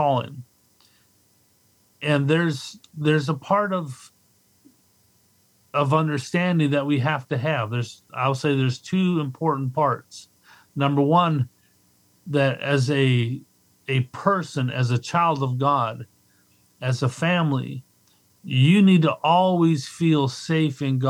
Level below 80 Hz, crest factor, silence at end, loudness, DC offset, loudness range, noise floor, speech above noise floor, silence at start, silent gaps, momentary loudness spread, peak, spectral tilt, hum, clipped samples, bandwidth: -72 dBFS; 18 dB; 0 s; -22 LUFS; under 0.1%; 5 LU; -62 dBFS; 40 dB; 0 s; none; 13 LU; -4 dBFS; -6.5 dB/octave; none; under 0.1%; 12 kHz